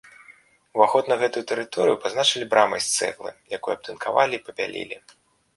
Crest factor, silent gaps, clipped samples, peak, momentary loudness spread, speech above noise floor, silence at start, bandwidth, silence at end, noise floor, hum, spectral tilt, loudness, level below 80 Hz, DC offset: 22 dB; none; under 0.1%; -2 dBFS; 13 LU; 30 dB; 0.3 s; 12 kHz; 0.6 s; -53 dBFS; none; -2 dB/octave; -23 LUFS; -68 dBFS; under 0.1%